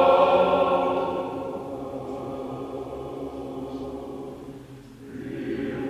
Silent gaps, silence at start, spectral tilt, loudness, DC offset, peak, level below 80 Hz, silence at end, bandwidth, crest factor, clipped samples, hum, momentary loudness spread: none; 0 s; -7 dB/octave; -27 LUFS; under 0.1%; -8 dBFS; -52 dBFS; 0 s; 12.5 kHz; 18 dB; under 0.1%; none; 20 LU